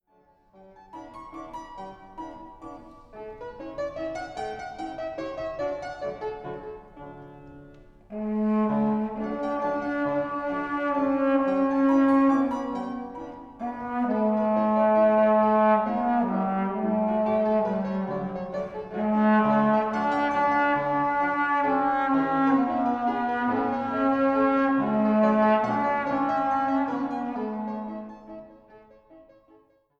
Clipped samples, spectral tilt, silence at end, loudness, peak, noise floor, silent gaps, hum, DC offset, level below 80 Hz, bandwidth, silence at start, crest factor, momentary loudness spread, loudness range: under 0.1%; -8 dB/octave; 0.8 s; -25 LUFS; -10 dBFS; -62 dBFS; none; none; under 0.1%; -56 dBFS; 7.4 kHz; 0.95 s; 16 dB; 20 LU; 13 LU